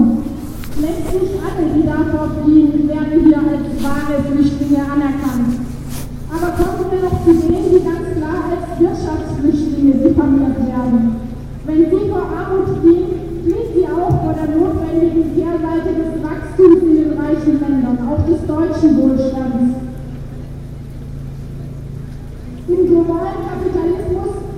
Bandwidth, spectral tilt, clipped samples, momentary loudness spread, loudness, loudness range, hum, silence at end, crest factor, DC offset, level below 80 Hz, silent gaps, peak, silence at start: 15 kHz; -8.5 dB/octave; under 0.1%; 17 LU; -15 LUFS; 5 LU; none; 0 s; 14 dB; under 0.1%; -30 dBFS; none; 0 dBFS; 0 s